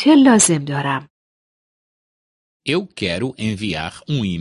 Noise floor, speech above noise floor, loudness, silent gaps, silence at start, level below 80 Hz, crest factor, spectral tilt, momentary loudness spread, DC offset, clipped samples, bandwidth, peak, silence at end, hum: under -90 dBFS; over 73 dB; -18 LUFS; 1.10-2.60 s; 0 s; -48 dBFS; 18 dB; -4 dB/octave; 14 LU; under 0.1%; under 0.1%; 11.5 kHz; 0 dBFS; 0 s; none